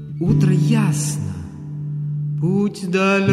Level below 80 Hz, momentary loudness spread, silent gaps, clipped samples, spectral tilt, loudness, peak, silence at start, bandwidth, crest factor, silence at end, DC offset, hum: -46 dBFS; 13 LU; none; under 0.1%; -6.5 dB/octave; -19 LUFS; -2 dBFS; 0 s; 13 kHz; 16 dB; 0 s; under 0.1%; none